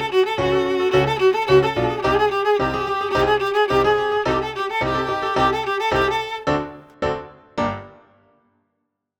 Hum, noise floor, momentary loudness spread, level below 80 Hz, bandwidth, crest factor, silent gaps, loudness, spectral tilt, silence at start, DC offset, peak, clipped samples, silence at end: none; -75 dBFS; 9 LU; -42 dBFS; 17 kHz; 18 dB; none; -20 LUFS; -5.5 dB/octave; 0 s; under 0.1%; -4 dBFS; under 0.1%; 1.3 s